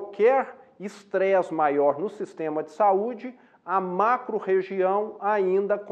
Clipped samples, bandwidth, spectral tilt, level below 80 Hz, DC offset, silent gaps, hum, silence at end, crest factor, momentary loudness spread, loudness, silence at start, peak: under 0.1%; 8.6 kHz; -7 dB/octave; -84 dBFS; under 0.1%; none; none; 0 s; 16 dB; 15 LU; -25 LUFS; 0 s; -10 dBFS